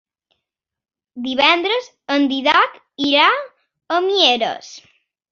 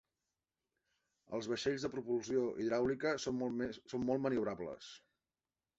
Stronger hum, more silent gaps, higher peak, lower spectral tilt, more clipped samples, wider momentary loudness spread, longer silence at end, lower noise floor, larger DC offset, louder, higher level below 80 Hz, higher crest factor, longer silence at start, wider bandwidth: neither; neither; first, 0 dBFS vs -22 dBFS; second, -2 dB/octave vs -4.5 dB/octave; neither; about the same, 10 LU vs 10 LU; second, 0.5 s vs 0.8 s; about the same, -88 dBFS vs under -90 dBFS; neither; first, -16 LUFS vs -38 LUFS; about the same, -66 dBFS vs -70 dBFS; about the same, 18 dB vs 18 dB; second, 1.15 s vs 1.3 s; second, 7.2 kHz vs 8 kHz